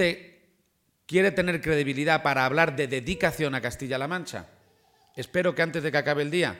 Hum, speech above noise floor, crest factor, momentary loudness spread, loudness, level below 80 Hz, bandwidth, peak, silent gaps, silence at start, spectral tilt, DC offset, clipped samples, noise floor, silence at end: none; 45 dB; 20 dB; 10 LU; -26 LUFS; -54 dBFS; 17 kHz; -6 dBFS; none; 0 s; -5 dB/octave; under 0.1%; under 0.1%; -71 dBFS; 0 s